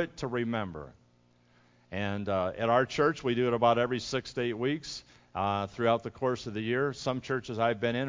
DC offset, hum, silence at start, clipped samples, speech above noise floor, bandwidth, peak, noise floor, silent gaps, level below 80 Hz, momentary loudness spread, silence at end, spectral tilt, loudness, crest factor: under 0.1%; none; 0 s; under 0.1%; 35 dB; 7.6 kHz; -10 dBFS; -65 dBFS; none; -58 dBFS; 11 LU; 0 s; -6 dB/octave; -30 LUFS; 20 dB